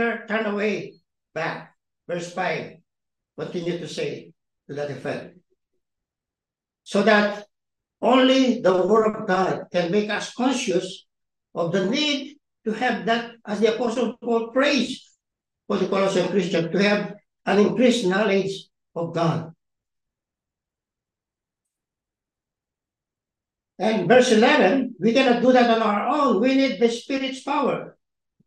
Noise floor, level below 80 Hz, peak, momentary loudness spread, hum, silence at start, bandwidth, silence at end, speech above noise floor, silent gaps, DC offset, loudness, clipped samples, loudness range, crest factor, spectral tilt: -89 dBFS; -68 dBFS; -4 dBFS; 15 LU; none; 0 s; 11 kHz; 0.55 s; 68 dB; none; under 0.1%; -22 LUFS; under 0.1%; 13 LU; 20 dB; -5 dB/octave